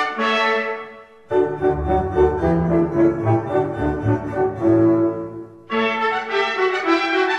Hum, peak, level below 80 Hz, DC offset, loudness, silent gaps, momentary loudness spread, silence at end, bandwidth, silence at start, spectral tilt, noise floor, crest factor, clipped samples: none; -4 dBFS; -38 dBFS; under 0.1%; -19 LUFS; none; 7 LU; 0 s; 8 kHz; 0 s; -7 dB/octave; -39 dBFS; 16 dB; under 0.1%